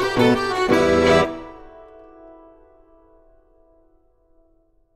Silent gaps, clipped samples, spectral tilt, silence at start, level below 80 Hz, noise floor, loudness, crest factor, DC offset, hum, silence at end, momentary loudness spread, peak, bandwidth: none; under 0.1%; -5.5 dB/octave; 0 s; -44 dBFS; -60 dBFS; -17 LUFS; 18 dB; under 0.1%; none; 3.4 s; 16 LU; -4 dBFS; 15.5 kHz